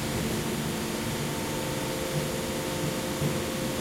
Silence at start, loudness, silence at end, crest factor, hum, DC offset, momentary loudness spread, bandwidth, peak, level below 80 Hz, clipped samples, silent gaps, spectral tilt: 0 s; -30 LUFS; 0 s; 14 dB; none; under 0.1%; 1 LU; 16.5 kHz; -16 dBFS; -48 dBFS; under 0.1%; none; -4.5 dB/octave